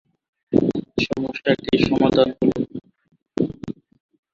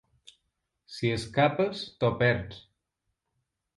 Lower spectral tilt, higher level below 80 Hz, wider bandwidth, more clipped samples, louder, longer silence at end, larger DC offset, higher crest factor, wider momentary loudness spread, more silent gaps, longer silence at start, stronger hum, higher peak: about the same, -7 dB/octave vs -6.5 dB/octave; first, -48 dBFS vs -56 dBFS; second, 7.6 kHz vs 11.5 kHz; neither; first, -21 LUFS vs -28 LUFS; second, 0.65 s vs 1.2 s; neither; about the same, 20 dB vs 22 dB; about the same, 17 LU vs 19 LU; neither; second, 0.5 s vs 0.9 s; neither; first, -2 dBFS vs -8 dBFS